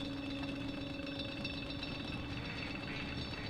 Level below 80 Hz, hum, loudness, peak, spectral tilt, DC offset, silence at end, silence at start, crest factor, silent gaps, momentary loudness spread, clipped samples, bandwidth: -54 dBFS; none; -41 LUFS; -28 dBFS; -5.5 dB/octave; under 0.1%; 0 s; 0 s; 14 dB; none; 1 LU; under 0.1%; 13.5 kHz